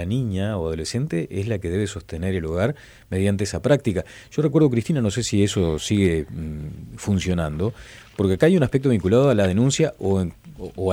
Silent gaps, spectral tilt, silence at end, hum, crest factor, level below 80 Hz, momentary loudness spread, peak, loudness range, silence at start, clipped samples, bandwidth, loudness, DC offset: none; -6.5 dB/octave; 0 s; none; 16 dB; -42 dBFS; 13 LU; -6 dBFS; 4 LU; 0 s; under 0.1%; 16 kHz; -22 LUFS; under 0.1%